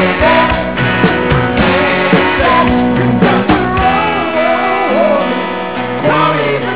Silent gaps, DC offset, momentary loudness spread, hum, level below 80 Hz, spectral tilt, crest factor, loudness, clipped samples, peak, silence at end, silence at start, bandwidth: none; 2%; 4 LU; none; -30 dBFS; -10 dB/octave; 12 dB; -11 LUFS; under 0.1%; 0 dBFS; 0 s; 0 s; 4 kHz